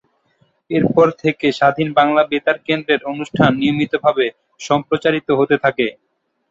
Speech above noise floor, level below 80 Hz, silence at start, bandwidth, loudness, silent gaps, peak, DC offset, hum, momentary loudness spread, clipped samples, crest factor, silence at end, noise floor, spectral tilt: 45 dB; -54 dBFS; 0.7 s; 8 kHz; -17 LUFS; none; -2 dBFS; under 0.1%; none; 7 LU; under 0.1%; 16 dB; 0.6 s; -61 dBFS; -6.5 dB/octave